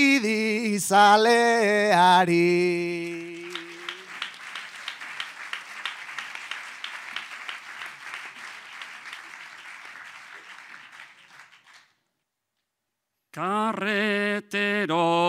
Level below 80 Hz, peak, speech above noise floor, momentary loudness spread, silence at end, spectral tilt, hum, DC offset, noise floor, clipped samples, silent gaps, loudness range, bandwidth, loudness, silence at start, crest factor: -78 dBFS; -6 dBFS; 61 dB; 23 LU; 0 s; -4 dB/octave; none; under 0.1%; -82 dBFS; under 0.1%; none; 23 LU; 16 kHz; -23 LUFS; 0 s; 18 dB